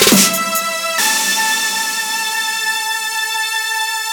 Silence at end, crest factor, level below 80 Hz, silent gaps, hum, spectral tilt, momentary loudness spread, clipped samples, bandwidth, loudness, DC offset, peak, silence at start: 0 s; 16 dB; -56 dBFS; none; none; -1 dB/octave; 5 LU; under 0.1%; over 20 kHz; -15 LUFS; under 0.1%; 0 dBFS; 0 s